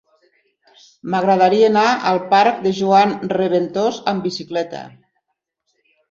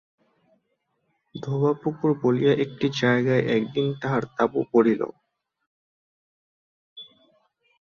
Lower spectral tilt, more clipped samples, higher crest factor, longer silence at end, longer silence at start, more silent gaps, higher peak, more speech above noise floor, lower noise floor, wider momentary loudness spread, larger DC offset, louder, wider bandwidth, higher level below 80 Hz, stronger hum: second, -5.5 dB/octave vs -7.5 dB/octave; neither; about the same, 16 dB vs 20 dB; first, 1.2 s vs 0.9 s; second, 1.05 s vs 1.35 s; second, none vs 5.67-6.96 s; first, -2 dBFS vs -6 dBFS; first, 58 dB vs 52 dB; about the same, -75 dBFS vs -74 dBFS; second, 11 LU vs 15 LU; neither; first, -16 LUFS vs -23 LUFS; about the same, 7.6 kHz vs 7.2 kHz; about the same, -64 dBFS vs -64 dBFS; neither